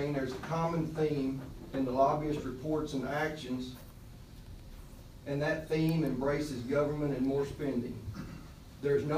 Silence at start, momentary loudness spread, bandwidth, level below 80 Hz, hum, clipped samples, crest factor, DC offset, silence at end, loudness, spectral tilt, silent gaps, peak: 0 s; 21 LU; 15.5 kHz; -52 dBFS; none; under 0.1%; 18 dB; under 0.1%; 0 s; -34 LUFS; -7 dB/octave; none; -16 dBFS